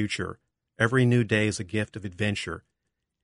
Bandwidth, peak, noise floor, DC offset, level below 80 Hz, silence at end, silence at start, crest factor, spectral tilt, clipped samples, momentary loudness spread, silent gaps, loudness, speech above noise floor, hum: 11 kHz; -6 dBFS; -82 dBFS; under 0.1%; -58 dBFS; 0.65 s; 0 s; 22 dB; -5.5 dB/octave; under 0.1%; 14 LU; none; -26 LUFS; 56 dB; none